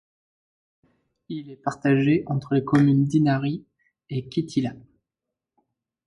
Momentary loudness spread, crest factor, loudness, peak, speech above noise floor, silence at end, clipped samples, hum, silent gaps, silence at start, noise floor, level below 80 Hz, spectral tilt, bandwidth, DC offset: 15 LU; 18 dB; -23 LUFS; -6 dBFS; 64 dB; 1.3 s; under 0.1%; none; none; 1.3 s; -86 dBFS; -62 dBFS; -8 dB/octave; 10.5 kHz; under 0.1%